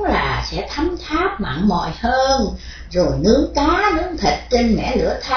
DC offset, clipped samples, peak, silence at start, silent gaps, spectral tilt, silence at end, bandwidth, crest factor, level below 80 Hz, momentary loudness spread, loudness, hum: under 0.1%; under 0.1%; -2 dBFS; 0 s; none; -5.5 dB/octave; 0 s; 5.4 kHz; 16 dB; -30 dBFS; 7 LU; -18 LUFS; none